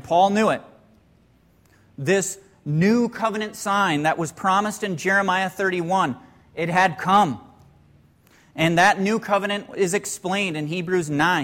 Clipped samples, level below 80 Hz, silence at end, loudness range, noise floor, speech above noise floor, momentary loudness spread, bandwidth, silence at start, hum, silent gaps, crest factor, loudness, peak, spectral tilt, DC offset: under 0.1%; -60 dBFS; 0 s; 2 LU; -57 dBFS; 36 dB; 10 LU; 16.5 kHz; 0.05 s; none; none; 16 dB; -21 LUFS; -6 dBFS; -4.5 dB/octave; under 0.1%